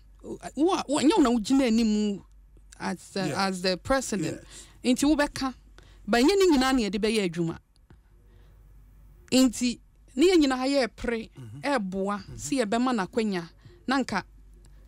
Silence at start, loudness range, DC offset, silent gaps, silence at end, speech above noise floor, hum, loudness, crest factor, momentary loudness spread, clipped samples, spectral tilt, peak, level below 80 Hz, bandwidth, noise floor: 0.25 s; 4 LU; under 0.1%; none; 0.65 s; 31 dB; none; -26 LUFS; 14 dB; 16 LU; under 0.1%; -4.5 dB/octave; -12 dBFS; -50 dBFS; 16 kHz; -56 dBFS